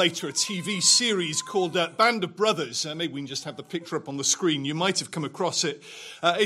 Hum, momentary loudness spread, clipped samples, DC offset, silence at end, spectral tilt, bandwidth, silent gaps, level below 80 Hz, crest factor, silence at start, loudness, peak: none; 13 LU; under 0.1%; under 0.1%; 0 s; -2.5 dB/octave; 16 kHz; none; -76 dBFS; 20 dB; 0 s; -25 LUFS; -6 dBFS